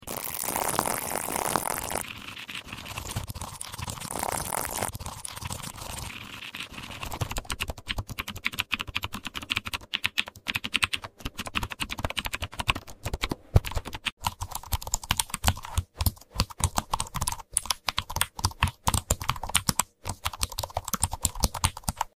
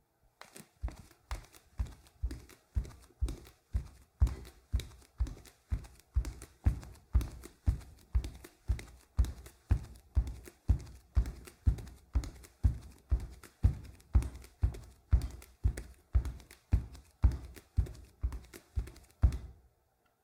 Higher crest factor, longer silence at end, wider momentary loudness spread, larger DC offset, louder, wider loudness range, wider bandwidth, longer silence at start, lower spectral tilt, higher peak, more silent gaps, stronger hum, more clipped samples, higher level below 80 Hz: first, 28 dB vs 20 dB; second, 0.1 s vs 0.7 s; second, 10 LU vs 15 LU; neither; first, -30 LUFS vs -38 LUFS; about the same, 5 LU vs 4 LU; first, 17 kHz vs 13.5 kHz; second, 0 s vs 0.55 s; second, -2.5 dB/octave vs -7 dB/octave; first, -2 dBFS vs -14 dBFS; first, 14.12-14.17 s vs none; neither; neither; about the same, -40 dBFS vs -38 dBFS